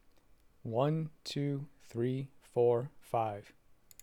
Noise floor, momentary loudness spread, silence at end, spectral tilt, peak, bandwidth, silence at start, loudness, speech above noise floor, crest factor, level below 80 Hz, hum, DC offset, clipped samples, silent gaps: -63 dBFS; 11 LU; 0.55 s; -7.5 dB/octave; -18 dBFS; 15.5 kHz; 0.65 s; -35 LUFS; 30 dB; 18 dB; -70 dBFS; none; under 0.1%; under 0.1%; none